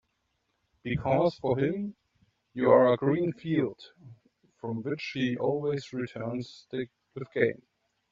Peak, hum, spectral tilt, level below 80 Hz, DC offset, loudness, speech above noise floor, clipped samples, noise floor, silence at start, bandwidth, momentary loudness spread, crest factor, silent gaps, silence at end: -8 dBFS; none; -6 dB/octave; -62 dBFS; under 0.1%; -29 LUFS; 49 dB; under 0.1%; -77 dBFS; 0.85 s; 7.6 kHz; 17 LU; 22 dB; none; 0.6 s